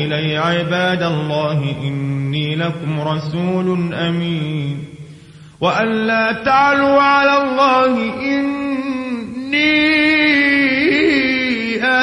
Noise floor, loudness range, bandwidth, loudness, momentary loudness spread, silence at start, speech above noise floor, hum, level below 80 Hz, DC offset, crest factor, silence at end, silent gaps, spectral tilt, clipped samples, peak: -39 dBFS; 6 LU; 11 kHz; -15 LUFS; 10 LU; 0 s; 23 dB; none; -52 dBFS; under 0.1%; 14 dB; 0 s; none; -6.5 dB/octave; under 0.1%; -2 dBFS